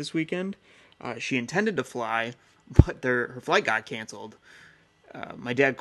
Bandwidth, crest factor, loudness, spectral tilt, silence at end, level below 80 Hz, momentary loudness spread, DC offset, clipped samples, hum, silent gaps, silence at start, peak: 12.5 kHz; 28 dB; -27 LUFS; -6 dB/octave; 0 s; -38 dBFS; 19 LU; under 0.1%; under 0.1%; none; none; 0 s; 0 dBFS